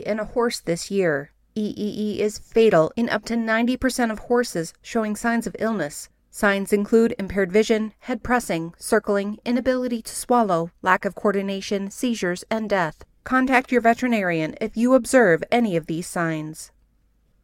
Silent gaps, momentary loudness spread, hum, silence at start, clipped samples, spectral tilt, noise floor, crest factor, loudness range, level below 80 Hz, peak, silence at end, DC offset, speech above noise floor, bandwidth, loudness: none; 10 LU; none; 0 s; under 0.1%; -5 dB/octave; -62 dBFS; 20 dB; 3 LU; -50 dBFS; -2 dBFS; 0.75 s; under 0.1%; 40 dB; 16.5 kHz; -22 LUFS